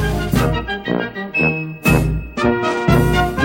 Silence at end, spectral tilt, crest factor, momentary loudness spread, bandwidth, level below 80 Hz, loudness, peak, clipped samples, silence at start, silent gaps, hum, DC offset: 0 s; -6 dB/octave; 16 dB; 7 LU; 17 kHz; -26 dBFS; -17 LUFS; 0 dBFS; under 0.1%; 0 s; none; none; under 0.1%